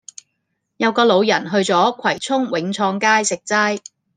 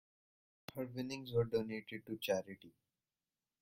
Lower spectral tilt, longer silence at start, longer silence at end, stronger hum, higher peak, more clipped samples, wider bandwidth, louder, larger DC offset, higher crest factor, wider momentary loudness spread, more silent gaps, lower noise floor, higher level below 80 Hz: second, -3.5 dB/octave vs -5.5 dB/octave; about the same, 0.8 s vs 0.75 s; second, 0.4 s vs 0.9 s; neither; first, -2 dBFS vs -22 dBFS; neither; second, 10 kHz vs 16.5 kHz; first, -17 LUFS vs -41 LUFS; neither; about the same, 18 dB vs 20 dB; second, 7 LU vs 17 LU; neither; second, -73 dBFS vs under -90 dBFS; about the same, -68 dBFS vs -70 dBFS